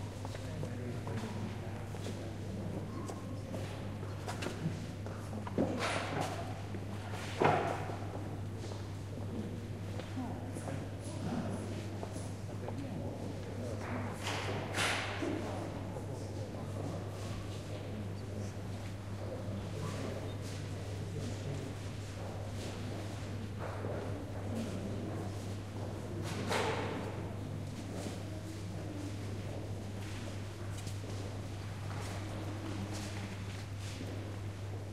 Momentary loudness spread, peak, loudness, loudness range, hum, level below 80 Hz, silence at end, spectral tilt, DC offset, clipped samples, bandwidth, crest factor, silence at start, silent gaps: 7 LU; -16 dBFS; -40 LUFS; 5 LU; none; -56 dBFS; 0 s; -5.5 dB/octave; 0.1%; under 0.1%; 14 kHz; 24 dB; 0 s; none